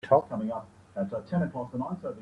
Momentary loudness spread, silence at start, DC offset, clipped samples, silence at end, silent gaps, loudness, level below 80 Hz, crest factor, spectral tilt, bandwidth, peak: 11 LU; 0.05 s; under 0.1%; under 0.1%; 0 s; none; -31 LUFS; -64 dBFS; 20 dB; -9.5 dB/octave; 9 kHz; -10 dBFS